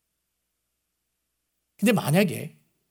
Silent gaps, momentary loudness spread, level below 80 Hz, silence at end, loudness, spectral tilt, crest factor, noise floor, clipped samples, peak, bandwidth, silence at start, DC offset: none; 15 LU; -74 dBFS; 0.4 s; -23 LUFS; -5.5 dB/octave; 22 dB; -79 dBFS; under 0.1%; -6 dBFS; 18.5 kHz; 1.8 s; under 0.1%